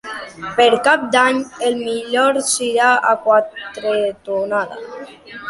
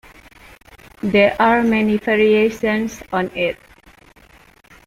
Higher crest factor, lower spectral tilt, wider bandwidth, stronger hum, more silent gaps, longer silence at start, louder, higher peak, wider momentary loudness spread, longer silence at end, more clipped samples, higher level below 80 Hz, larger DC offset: about the same, 16 dB vs 18 dB; second, -2 dB/octave vs -6 dB/octave; second, 11.5 kHz vs 15 kHz; neither; neither; second, 0.05 s vs 1.05 s; about the same, -16 LUFS vs -17 LUFS; about the same, -2 dBFS vs -2 dBFS; first, 15 LU vs 9 LU; second, 0 s vs 1.3 s; neither; second, -60 dBFS vs -48 dBFS; neither